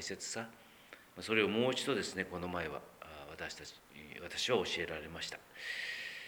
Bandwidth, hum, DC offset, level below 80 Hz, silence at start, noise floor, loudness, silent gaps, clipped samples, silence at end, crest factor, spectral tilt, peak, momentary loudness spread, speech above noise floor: over 20 kHz; none; under 0.1%; -68 dBFS; 0 s; -58 dBFS; -38 LUFS; none; under 0.1%; 0 s; 22 dB; -3.5 dB/octave; -18 dBFS; 19 LU; 20 dB